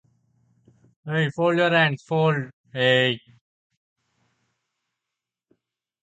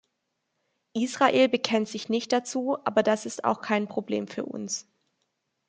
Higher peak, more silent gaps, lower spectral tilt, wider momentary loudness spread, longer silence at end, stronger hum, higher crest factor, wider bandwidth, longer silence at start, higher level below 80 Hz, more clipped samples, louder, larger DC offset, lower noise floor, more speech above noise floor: about the same, -6 dBFS vs -6 dBFS; first, 2.53-2.64 s vs none; first, -6.5 dB/octave vs -4 dB/octave; about the same, 12 LU vs 11 LU; first, 2.85 s vs 0.85 s; neither; about the same, 20 dB vs 22 dB; about the same, 8.6 kHz vs 9.4 kHz; about the same, 1.05 s vs 0.95 s; first, -70 dBFS vs -76 dBFS; neither; first, -22 LUFS vs -27 LUFS; neither; first, -86 dBFS vs -79 dBFS; first, 65 dB vs 53 dB